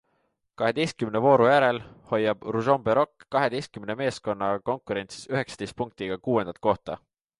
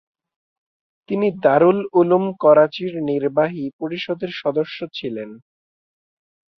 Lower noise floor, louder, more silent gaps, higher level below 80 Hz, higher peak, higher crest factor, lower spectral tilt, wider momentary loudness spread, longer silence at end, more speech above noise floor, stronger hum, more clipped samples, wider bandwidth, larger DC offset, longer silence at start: second, -73 dBFS vs under -90 dBFS; second, -26 LUFS vs -19 LUFS; second, none vs 3.73-3.79 s; first, -60 dBFS vs -66 dBFS; second, -6 dBFS vs -2 dBFS; about the same, 20 dB vs 18 dB; second, -6 dB/octave vs -8.5 dB/octave; about the same, 13 LU vs 13 LU; second, 0.4 s vs 1.2 s; second, 48 dB vs over 72 dB; neither; neither; first, 11.5 kHz vs 6 kHz; neither; second, 0.6 s vs 1.1 s